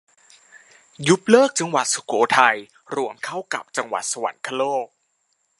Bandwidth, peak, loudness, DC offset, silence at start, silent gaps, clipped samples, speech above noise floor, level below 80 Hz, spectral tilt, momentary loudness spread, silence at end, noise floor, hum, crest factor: 11.5 kHz; 0 dBFS; -21 LUFS; under 0.1%; 1 s; none; under 0.1%; 49 dB; -72 dBFS; -3.5 dB/octave; 13 LU; 0.75 s; -69 dBFS; none; 22 dB